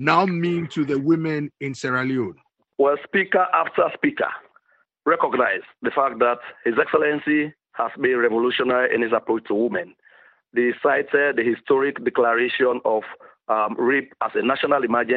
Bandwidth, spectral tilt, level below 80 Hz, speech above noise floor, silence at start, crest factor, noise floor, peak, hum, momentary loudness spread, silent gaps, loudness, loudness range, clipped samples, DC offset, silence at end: 8.2 kHz; -6.5 dB/octave; -68 dBFS; 39 dB; 0 s; 20 dB; -60 dBFS; -2 dBFS; none; 8 LU; none; -21 LUFS; 1 LU; under 0.1%; under 0.1%; 0 s